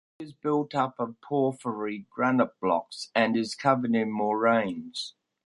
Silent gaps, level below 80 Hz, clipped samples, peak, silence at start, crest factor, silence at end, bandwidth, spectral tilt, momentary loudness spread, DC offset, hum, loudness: none; -70 dBFS; under 0.1%; -8 dBFS; 0.2 s; 20 dB; 0.35 s; 11.5 kHz; -5.5 dB/octave; 10 LU; under 0.1%; none; -27 LUFS